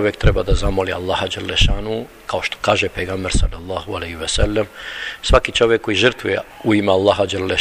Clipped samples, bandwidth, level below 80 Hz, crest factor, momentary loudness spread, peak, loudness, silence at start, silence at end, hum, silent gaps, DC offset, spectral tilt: under 0.1%; 15 kHz; -24 dBFS; 18 dB; 11 LU; 0 dBFS; -19 LUFS; 0 s; 0 s; none; none; under 0.1%; -4.5 dB/octave